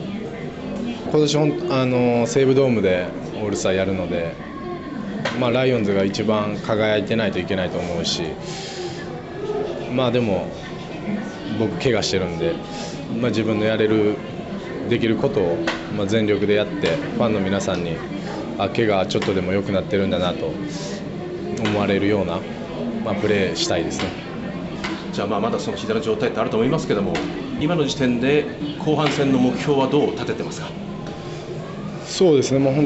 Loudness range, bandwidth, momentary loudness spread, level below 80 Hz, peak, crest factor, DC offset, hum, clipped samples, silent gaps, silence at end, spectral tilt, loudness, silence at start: 4 LU; 8.4 kHz; 11 LU; -48 dBFS; -6 dBFS; 16 dB; under 0.1%; none; under 0.1%; none; 0 s; -5.5 dB/octave; -22 LUFS; 0 s